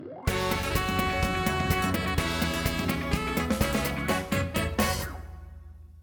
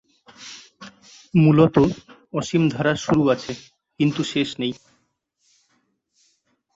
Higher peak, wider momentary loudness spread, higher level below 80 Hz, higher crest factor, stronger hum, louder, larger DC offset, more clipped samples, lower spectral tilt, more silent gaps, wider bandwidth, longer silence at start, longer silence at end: second, -10 dBFS vs -2 dBFS; second, 9 LU vs 23 LU; first, -38 dBFS vs -54 dBFS; about the same, 18 dB vs 20 dB; neither; second, -28 LUFS vs -20 LUFS; neither; neither; second, -4.5 dB/octave vs -6.5 dB/octave; neither; first, over 20 kHz vs 7.8 kHz; second, 0 s vs 0.4 s; second, 0 s vs 2 s